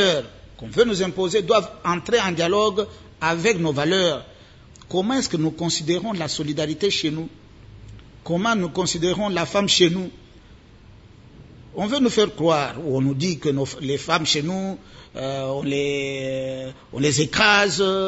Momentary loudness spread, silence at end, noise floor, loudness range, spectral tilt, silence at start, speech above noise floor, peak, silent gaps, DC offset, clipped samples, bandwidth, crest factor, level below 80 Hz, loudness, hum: 12 LU; 0 s; -47 dBFS; 3 LU; -4 dB/octave; 0 s; 26 dB; -2 dBFS; none; under 0.1%; under 0.1%; 8 kHz; 20 dB; -52 dBFS; -21 LUFS; none